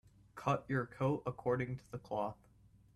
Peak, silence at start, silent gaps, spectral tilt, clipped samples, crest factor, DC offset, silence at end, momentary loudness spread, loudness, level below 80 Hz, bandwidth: -18 dBFS; 0.35 s; none; -8 dB/octave; under 0.1%; 20 dB; under 0.1%; 0.6 s; 10 LU; -39 LUFS; -66 dBFS; 12 kHz